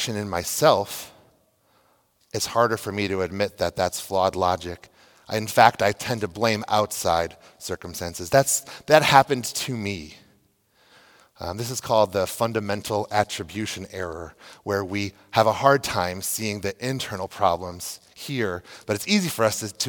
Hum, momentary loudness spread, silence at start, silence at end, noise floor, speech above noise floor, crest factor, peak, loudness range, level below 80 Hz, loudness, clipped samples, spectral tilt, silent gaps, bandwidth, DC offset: none; 15 LU; 0 s; 0 s; -64 dBFS; 40 dB; 24 dB; 0 dBFS; 5 LU; -58 dBFS; -23 LUFS; under 0.1%; -3.5 dB/octave; none; 18 kHz; under 0.1%